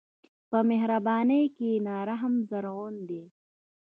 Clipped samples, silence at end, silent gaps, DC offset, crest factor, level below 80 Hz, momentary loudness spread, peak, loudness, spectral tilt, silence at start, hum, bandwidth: under 0.1%; 0.6 s; none; under 0.1%; 16 dB; -82 dBFS; 13 LU; -12 dBFS; -28 LUFS; -9.5 dB/octave; 0.5 s; none; 4 kHz